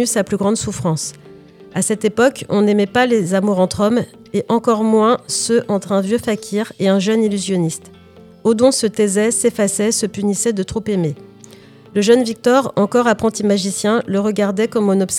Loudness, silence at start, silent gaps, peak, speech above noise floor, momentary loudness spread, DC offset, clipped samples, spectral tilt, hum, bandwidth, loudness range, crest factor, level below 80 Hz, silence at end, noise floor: -16 LUFS; 0 s; none; 0 dBFS; 26 dB; 7 LU; under 0.1%; under 0.1%; -4.5 dB/octave; none; 16 kHz; 2 LU; 16 dB; -52 dBFS; 0 s; -42 dBFS